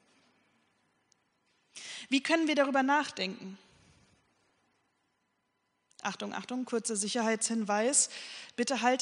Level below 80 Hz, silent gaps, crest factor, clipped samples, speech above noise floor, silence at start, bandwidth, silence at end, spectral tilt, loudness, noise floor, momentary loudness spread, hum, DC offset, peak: -82 dBFS; none; 22 dB; under 0.1%; 48 dB; 1.75 s; 10.5 kHz; 0 s; -2 dB/octave; -30 LUFS; -78 dBFS; 16 LU; none; under 0.1%; -12 dBFS